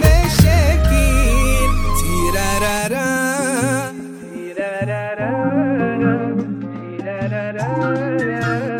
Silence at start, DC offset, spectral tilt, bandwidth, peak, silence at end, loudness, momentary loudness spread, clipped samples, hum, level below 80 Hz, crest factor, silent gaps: 0 s; under 0.1%; -5.5 dB/octave; 16.5 kHz; 0 dBFS; 0 s; -18 LUFS; 13 LU; under 0.1%; none; -20 dBFS; 16 dB; none